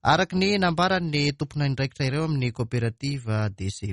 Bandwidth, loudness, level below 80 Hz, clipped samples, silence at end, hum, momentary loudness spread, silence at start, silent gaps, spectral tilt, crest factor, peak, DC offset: 11 kHz; -25 LUFS; -50 dBFS; under 0.1%; 0 s; none; 6 LU; 0.05 s; none; -6 dB/octave; 18 dB; -8 dBFS; under 0.1%